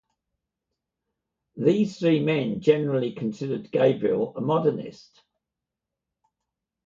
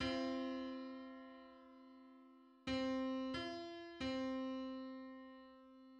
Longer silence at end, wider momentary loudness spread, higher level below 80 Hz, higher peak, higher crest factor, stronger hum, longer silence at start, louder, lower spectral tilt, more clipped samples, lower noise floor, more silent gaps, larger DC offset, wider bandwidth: first, 1.95 s vs 0 s; second, 8 LU vs 20 LU; about the same, -68 dBFS vs -70 dBFS; first, -6 dBFS vs -28 dBFS; about the same, 20 dB vs 18 dB; neither; first, 1.55 s vs 0 s; first, -24 LUFS vs -45 LUFS; first, -8 dB/octave vs -5 dB/octave; neither; first, -86 dBFS vs -65 dBFS; neither; neither; second, 7.6 kHz vs 9 kHz